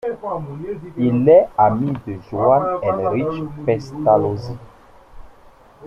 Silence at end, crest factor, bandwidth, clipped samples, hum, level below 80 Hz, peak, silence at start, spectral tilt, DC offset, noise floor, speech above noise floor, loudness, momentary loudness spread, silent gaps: 0 s; 18 dB; 7.2 kHz; under 0.1%; none; -48 dBFS; -2 dBFS; 0.05 s; -9.5 dB/octave; under 0.1%; -47 dBFS; 29 dB; -18 LUFS; 16 LU; none